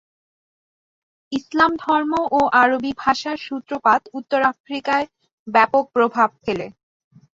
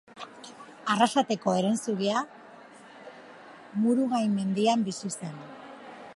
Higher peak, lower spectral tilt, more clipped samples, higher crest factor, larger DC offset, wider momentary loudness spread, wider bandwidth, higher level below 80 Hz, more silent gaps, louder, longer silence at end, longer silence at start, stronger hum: first, -2 dBFS vs -8 dBFS; about the same, -4.5 dB/octave vs -5 dB/octave; neither; about the same, 18 dB vs 20 dB; neither; second, 12 LU vs 22 LU; second, 7.8 kHz vs 11.5 kHz; first, -58 dBFS vs -76 dBFS; first, 4.60-4.64 s, 5.33-5.46 s vs none; first, -19 LUFS vs -27 LUFS; first, 0.7 s vs 0 s; first, 1.3 s vs 0.15 s; neither